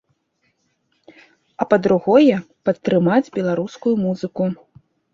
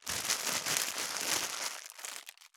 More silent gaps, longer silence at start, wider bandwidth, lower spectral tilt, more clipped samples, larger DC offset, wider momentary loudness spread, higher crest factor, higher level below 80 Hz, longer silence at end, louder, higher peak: neither; first, 1.6 s vs 0 s; second, 7.6 kHz vs over 20 kHz; first, -8 dB/octave vs 0.5 dB/octave; neither; neither; about the same, 10 LU vs 12 LU; second, 18 dB vs 32 dB; first, -60 dBFS vs -74 dBFS; first, 0.6 s vs 0.1 s; first, -18 LUFS vs -33 LUFS; first, 0 dBFS vs -4 dBFS